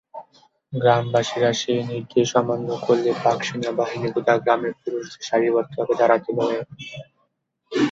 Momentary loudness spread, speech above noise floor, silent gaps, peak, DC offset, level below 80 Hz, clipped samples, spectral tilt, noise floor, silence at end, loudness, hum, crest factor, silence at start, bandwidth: 11 LU; 50 dB; none; -2 dBFS; under 0.1%; -64 dBFS; under 0.1%; -5.5 dB/octave; -71 dBFS; 0 s; -22 LUFS; none; 20 dB; 0.15 s; 7.8 kHz